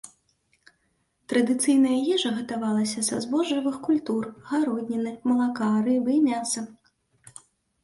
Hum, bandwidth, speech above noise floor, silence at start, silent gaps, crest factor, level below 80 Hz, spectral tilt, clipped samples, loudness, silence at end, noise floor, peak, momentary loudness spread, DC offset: none; 11.5 kHz; 47 dB; 0.05 s; none; 14 dB; -68 dBFS; -4 dB/octave; under 0.1%; -25 LUFS; 0.55 s; -71 dBFS; -12 dBFS; 8 LU; under 0.1%